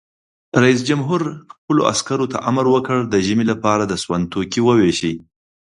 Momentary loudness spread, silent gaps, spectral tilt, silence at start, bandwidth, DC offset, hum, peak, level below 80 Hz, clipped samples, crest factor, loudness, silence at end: 7 LU; 1.58-1.68 s; -5.5 dB/octave; 0.55 s; 11.5 kHz; under 0.1%; none; 0 dBFS; -50 dBFS; under 0.1%; 18 dB; -18 LUFS; 0.45 s